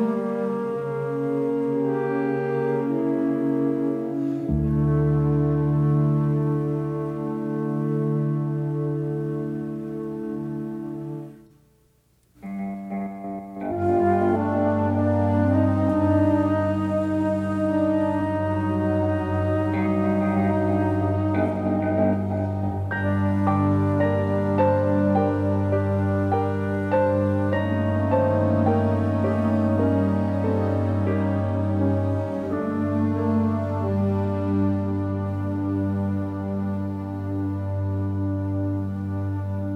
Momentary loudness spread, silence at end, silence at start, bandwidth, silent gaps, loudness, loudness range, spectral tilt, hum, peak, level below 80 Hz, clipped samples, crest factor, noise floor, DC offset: 8 LU; 0 s; 0 s; 5 kHz; none; -24 LUFS; 6 LU; -10 dB/octave; none; -8 dBFS; -48 dBFS; under 0.1%; 14 dB; -62 dBFS; under 0.1%